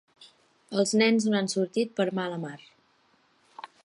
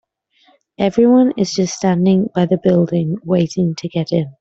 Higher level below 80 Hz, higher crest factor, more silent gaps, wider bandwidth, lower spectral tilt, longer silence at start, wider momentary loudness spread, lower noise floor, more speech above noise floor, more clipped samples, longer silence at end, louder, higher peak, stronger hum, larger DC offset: second, -78 dBFS vs -54 dBFS; about the same, 20 dB vs 16 dB; neither; first, 11.5 kHz vs 7.8 kHz; second, -4.5 dB/octave vs -7 dB/octave; second, 0.2 s vs 0.8 s; first, 22 LU vs 8 LU; first, -66 dBFS vs -56 dBFS; about the same, 40 dB vs 41 dB; neither; about the same, 0.2 s vs 0.1 s; second, -26 LUFS vs -16 LUFS; second, -10 dBFS vs 0 dBFS; neither; neither